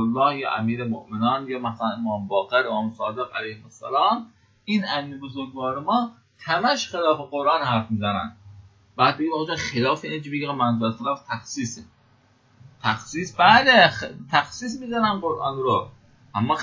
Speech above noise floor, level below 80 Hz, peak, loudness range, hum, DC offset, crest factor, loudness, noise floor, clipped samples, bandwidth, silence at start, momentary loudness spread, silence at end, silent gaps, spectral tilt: 36 dB; -58 dBFS; -2 dBFS; 7 LU; none; under 0.1%; 22 dB; -23 LUFS; -59 dBFS; under 0.1%; 7.6 kHz; 0 s; 12 LU; 0 s; none; -4.5 dB/octave